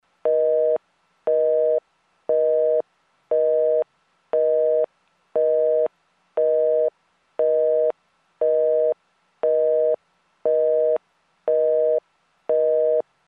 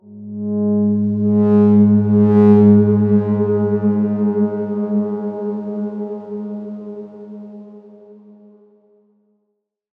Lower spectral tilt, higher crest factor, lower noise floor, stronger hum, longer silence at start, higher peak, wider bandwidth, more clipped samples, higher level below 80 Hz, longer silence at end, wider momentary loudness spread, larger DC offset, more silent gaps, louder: second, -7 dB/octave vs -12.5 dB/octave; second, 10 dB vs 16 dB; second, -66 dBFS vs -72 dBFS; neither; first, 0.25 s vs 0.1 s; second, -10 dBFS vs -2 dBFS; first, 3.5 kHz vs 2.7 kHz; neither; second, -82 dBFS vs -70 dBFS; second, 0.25 s vs 1.85 s; second, 9 LU vs 21 LU; neither; neither; second, -22 LUFS vs -15 LUFS